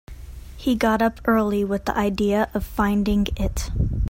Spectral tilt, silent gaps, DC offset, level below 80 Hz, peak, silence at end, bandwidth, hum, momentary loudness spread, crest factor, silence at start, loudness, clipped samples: -6.5 dB/octave; none; under 0.1%; -32 dBFS; -6 dBFS; 0 s; 16.5 kHz; none; 7 LU; 16 dB; 0.1 s; -22 LUFS; under 0.1%